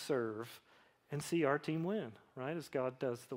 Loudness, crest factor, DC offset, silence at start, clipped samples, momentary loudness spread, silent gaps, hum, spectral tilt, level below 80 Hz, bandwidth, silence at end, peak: -39 LUFS; 20 dB; under 0.1%; 0 s; under 0.1%; 13 LU; none; none; -6 dB/octave; -80 dBFS; 16 kHz; 0 s; -20 dBFS